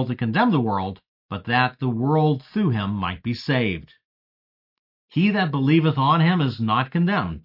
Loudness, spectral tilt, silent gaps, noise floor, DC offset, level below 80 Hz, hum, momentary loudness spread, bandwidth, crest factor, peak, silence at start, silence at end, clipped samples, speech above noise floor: -21 LUFS; -9 dB/octave; 1.08-1.29 s, 4.05-5.08 s; under -90 dBFS; under 0.1%; -56 dBFS; none; 9 LU; 5.8 kHz; 16 dB; -6 dBFS; 0 s; 0.05 s; under 0.1%; over 69 dB